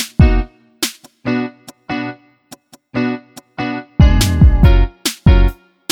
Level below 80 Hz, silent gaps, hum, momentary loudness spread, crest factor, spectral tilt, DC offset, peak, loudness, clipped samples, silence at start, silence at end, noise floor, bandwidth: -16 dBFS; none; none; 16 LU; 14 dB; -5.5 dB/octave; under 0.1%; 0 dBFS; -15 LUFS; under 0.1%; 0 s; 0.4 s; -43 dBFS; 17 kHz